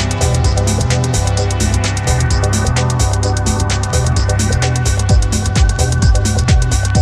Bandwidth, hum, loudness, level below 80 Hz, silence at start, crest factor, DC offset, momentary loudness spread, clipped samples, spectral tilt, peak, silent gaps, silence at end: 13.5 kHz; none; -14 LUFS; -18 dBFS; 0 s; 12 dB; under 0.1%; 2 LU; under 0.1%; -4.5 dB/octave; 0 dBFS; none; 0 s